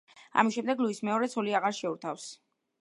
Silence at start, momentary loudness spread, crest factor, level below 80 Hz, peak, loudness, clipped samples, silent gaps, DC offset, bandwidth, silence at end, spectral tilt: 0.15 s; 11 LU; 24 dB; -84 dBFS; -8 dBFS; -30 LUFS; under 0.1%; none; under 0.1%; 11.5 kHz; 0.5 s; -4.5 dB/octave